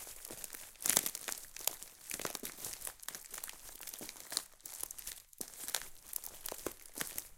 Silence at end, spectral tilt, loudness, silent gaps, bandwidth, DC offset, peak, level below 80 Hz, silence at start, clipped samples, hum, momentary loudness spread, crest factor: 0 s; 0 dB/octave; -40 LUFS; none; 17 kHz; under 0.1%; -6 dBFS; -66 dBFS; 0 s; under 0.1%; none; 12 LU; 36 dB